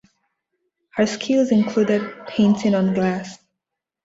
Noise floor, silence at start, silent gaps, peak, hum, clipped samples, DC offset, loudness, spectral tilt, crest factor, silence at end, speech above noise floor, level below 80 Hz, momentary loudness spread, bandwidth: -83 dBFS; 0.95 s; none; -6 dBFS; none; under 0.1%; under 0.1%; -20 LUFS; -6.5 dB/octave; 16 dB; 0.7 s; 64 dB; -60 dBFS; 11 LU; 7.8 kHz